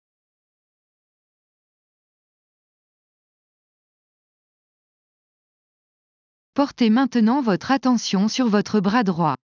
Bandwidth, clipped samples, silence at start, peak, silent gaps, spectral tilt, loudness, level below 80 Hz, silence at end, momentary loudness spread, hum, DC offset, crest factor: 7.4 kHz; under 0.1%; 6.55 s; -6 dBFS; none; -5.5 dB/octave; -20 LUFS; -66 dBFS; 0.15 s; 5 LU; none; under 0.1%; 18 dB